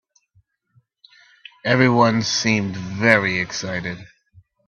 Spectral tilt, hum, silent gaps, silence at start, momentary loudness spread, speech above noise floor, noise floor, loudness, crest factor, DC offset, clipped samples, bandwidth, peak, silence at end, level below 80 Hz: -4.5 dB/octave; none; none; 1.65 s; 13 LU; 43 dB; -62 dBFS; -19 LUFS; 22 dB; under 0.1%; under 0.1%; 8.6 kHz; 0 dBFS; 0.6 s; -58 dBFS